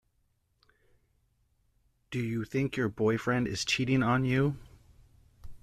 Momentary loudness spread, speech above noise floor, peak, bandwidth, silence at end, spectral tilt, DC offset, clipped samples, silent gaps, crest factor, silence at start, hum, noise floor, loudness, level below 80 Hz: 8 LU; 45 dB; -14 dBFS; 13.5 kHz; 0.05 s; -5.5 dB/octave; under 0.1%; under 0.1%; none; 18 dB; 2.1 s; none; -74 dBFS; -30 LUFS; -56 dBFS